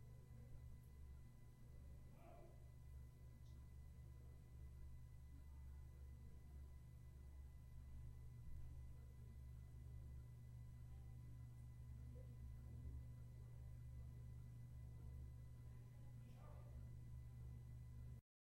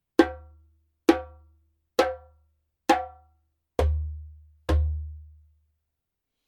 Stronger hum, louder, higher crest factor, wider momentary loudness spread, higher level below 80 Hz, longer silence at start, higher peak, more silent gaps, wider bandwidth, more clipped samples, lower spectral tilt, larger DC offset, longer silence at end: neither; second, -61 LUFS vs -27 LUFS; second, 14 dB vs 26 dB; second, 5 LU vs 19 LU; second, -60 dBFS vs -36 dBFS; second, 0 s vs 0.2 s; second, -44 dBFS vs -4 dBFS; neither; first, 16 kHz vs 14.5 kHz; neither; about the same, -7.5 dB/octave vs -6.5 dB/octave; neither; second, 0.35 s vs 1.25 s